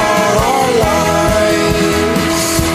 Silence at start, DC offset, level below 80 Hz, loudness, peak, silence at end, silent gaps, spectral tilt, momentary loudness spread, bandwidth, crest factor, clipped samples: 0 s; under 0.1%; -28 dBFS; -12 LUFS; 0 dBFS; 0 s; none; -4 dB/octave; 1 LU; 15.5 kHz; 12 dB; under 0.1%